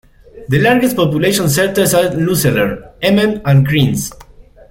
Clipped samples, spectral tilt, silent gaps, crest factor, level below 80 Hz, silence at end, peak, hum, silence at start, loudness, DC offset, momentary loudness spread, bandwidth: under 0.1%; -5 dB/octave; none; 12 dB; -40 dBFS; 0.3 s; 0 dBFS; none; 0.35 s; -13 LUFS; under 0.1%; 6 LU; 16.5 kHz